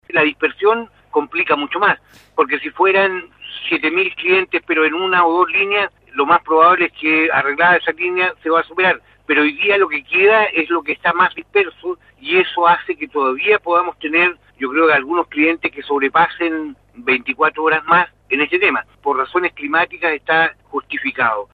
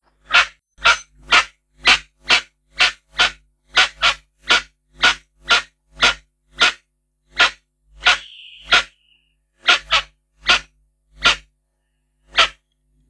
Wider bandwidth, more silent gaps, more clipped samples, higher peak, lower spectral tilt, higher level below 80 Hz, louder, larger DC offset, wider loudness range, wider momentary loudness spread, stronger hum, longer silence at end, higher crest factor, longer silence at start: second, 4.8 kHz vs 11 kHz; neither; neither; about the same, 0 dBFS vs 0 dBFS; first, -6.5 dB/octave vs 0.5 dB/octave; second, -58 dBFS vs -46 dBFS; about the same, -16 LUFS vs -16 LUFS; neither; about the same, 3 LU vs 3 LU; about the same, 8 LU vs 8 LU; neither; second, 0.1 s vs 0.6 s; about the same, 16 dB vs 20 dB; second, 0.15 s vs 0.3 s